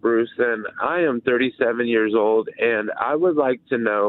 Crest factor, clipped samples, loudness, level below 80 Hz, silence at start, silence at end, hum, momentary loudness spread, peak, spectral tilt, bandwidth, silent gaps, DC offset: 16 dB; under 0.1%; -21 LUFS; -64 dBFS; 0.05 s; 0 s; none; 4 LU; -6 dBFS; -9.5 dB/octave; 4.2 kHz; none; under 0.1%